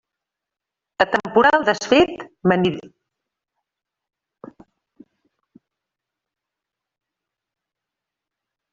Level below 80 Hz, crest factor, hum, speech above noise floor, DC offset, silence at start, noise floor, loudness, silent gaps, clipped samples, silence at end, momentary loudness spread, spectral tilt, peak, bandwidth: -58 dBFS; 22 dB; none; 68 dB; under 0.1%; 1 s; -86 dBFS; -18 LUFS; none; under 0.1%; 5.85 s; 8 LU; -3.5 dB/octave; -2 dBFS; 7.6 kHz